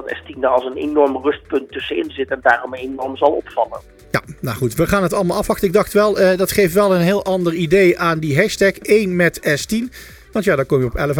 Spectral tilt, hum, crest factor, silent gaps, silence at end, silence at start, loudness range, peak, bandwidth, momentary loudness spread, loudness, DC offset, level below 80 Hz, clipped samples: -5.5 dB/octave; none; 16 dB; none; 0 s; 0 s; 5 LU; 0 dBFS; 19 kHz; 9 LU; -17 LUFS; under 0.1%; -40 dBFS; under 0.1%